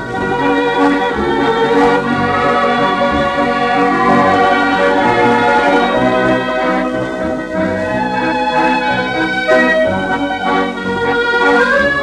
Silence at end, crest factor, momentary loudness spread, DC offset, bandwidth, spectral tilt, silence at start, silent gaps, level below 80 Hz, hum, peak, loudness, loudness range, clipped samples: 0 s; 12 dB; 6 LU; under 0.1%; 11.5 kHz; -5.5 dB/octave; 0 s; none; -40 dBFS; none; 0 dBFS; -13 LUFS; 3 LU; under 0.1%